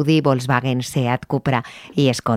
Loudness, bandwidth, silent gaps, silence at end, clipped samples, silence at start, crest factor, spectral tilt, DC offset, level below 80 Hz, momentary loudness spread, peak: -20 LUFS; 15.5 kHz; none; 0 s; under 0.1%; 0 s; 18 dB; -6 dB/octave; under 0.1%; -54 dBFS; 5 LU; -2 dBFS